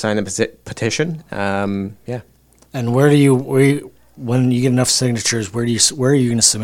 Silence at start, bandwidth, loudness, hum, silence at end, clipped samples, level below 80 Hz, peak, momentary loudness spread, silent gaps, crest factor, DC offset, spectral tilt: 0 s; 16.5 kHz; -16 LUFS; none; 0 s; under 0.1%; -50 dBFS; 0 dBFS; 12 LU; none; 16 dB; under 0.1%; -4.5 dB/octave